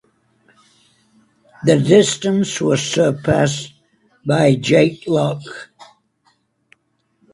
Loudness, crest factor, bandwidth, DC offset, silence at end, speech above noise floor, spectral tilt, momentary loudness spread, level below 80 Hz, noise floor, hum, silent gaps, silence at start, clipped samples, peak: -16 LUFS; 18 dB; 11.5 kHz; under 0.1%; 1.5 s; 49 dB; -5.5 dB/octave; 16 LU; -52 dBFS; -65 dBFS; none; none; 1.6 s; under 0.1%; 0 dBFS